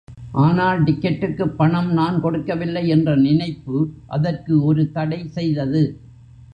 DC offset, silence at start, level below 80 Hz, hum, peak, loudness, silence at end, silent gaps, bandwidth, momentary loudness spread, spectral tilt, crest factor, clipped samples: under 0.1%; 0.1 s; -48 dBFS; none; -4 dBFS; -19 LUFS; 0.1 s; none; 5.2 kHz; 7 LU; -9.5 dB/octave; 16 dB; under 0.1%